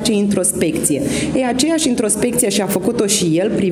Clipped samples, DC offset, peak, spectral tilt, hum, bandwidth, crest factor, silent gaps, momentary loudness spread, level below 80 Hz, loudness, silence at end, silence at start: under 0.1%; under 0.1%; 0 dBFS; -4 dB/octave; none; over 20 kHz; 16 dB; none; 3 LU; -46 dBFS; -16 LUFS; 0 s; 0 s